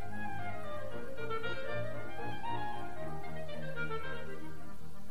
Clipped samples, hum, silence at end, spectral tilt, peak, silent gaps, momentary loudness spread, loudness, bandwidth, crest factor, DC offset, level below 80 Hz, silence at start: under 0.1%; none; 0 s; -6 dB/octave; -24 dBFS; none; 8 LU; -42 LUFS; 15.5 kHz; 16 dB; 3%; -58 dBFS; 0 s